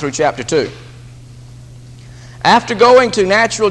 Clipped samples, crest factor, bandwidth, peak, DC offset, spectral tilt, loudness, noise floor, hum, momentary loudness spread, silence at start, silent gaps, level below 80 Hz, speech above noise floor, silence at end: under 0.1%; 14 dB; 11 kHz; 0 dBFS; under 0.1%; -4 dB/octave; -12 LUFS; -35 dBFS; none; 9 LU; 0 s; none; -44 dBFS; 23 dB; 0 s